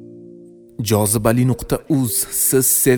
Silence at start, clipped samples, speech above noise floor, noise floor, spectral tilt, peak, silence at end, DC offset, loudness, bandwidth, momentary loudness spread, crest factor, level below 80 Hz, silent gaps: 0 s; under 0.1%; 25 dB; -42 dBFS; -4.5 dB/octave; -2 dBFS; 0 s; under 0.1%; -17 LUFS; 19.5 kHz; 7 LU; 16 dB; -42 dBFS; none